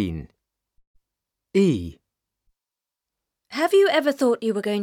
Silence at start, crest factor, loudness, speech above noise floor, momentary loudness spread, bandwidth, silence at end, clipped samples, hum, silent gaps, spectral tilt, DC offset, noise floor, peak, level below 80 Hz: 0 s; 18 dB; -21 LUFS; 67 dB; 16 LU; 16 kHz; 0 s; under 0.1%; none; 0.87-0.94 s; -6 dB/octave; under 0.1%; -88 dBFS; -8 dBFS; -52 dBFS